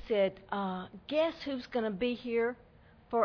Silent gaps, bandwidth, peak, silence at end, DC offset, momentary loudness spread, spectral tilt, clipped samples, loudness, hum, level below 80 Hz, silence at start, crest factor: none; 5.4 kHz; -16 dBFS; 0 s; under 0.1%; 7 LU; -7 dB/octave; under 0.1%; -34 LUFS; none; -62 dBFS; 0 s; 18 dB